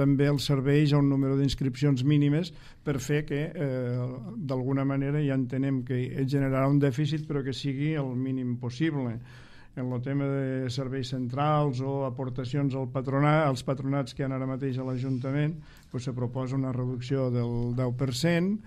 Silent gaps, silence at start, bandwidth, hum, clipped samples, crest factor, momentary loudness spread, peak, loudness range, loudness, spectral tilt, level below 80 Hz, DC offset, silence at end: none; 0 s; 13 kHz; none; under 0.1%; 16 dB; 9 LU; -12 dBFS; 4 LU; -28 LUFS; -7.5 dB/octave; -50 dBFS; under 0.1%; 0 s